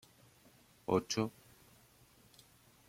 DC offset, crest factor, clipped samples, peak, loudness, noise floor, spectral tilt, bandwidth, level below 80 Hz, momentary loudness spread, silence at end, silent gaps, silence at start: under 0.1%; 26 dB; under 0.1%; -16 dBFS; -37 LUFS; -65 dBFS; -5 dB/octave; 16.5 kHz; -74 dBFS; 27 LU; 1.6 s; none; 0.9 s